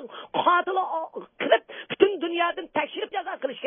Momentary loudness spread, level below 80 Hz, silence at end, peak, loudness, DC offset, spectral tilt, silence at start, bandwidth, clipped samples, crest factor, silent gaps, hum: 10 LU; -72 dBFS; 0 s; -2 dBFS; -25 LUFS; under 0.1%; -8 dB/octave; 0 s; 3.7 kHz; under 0.1%; 24 dB; none; none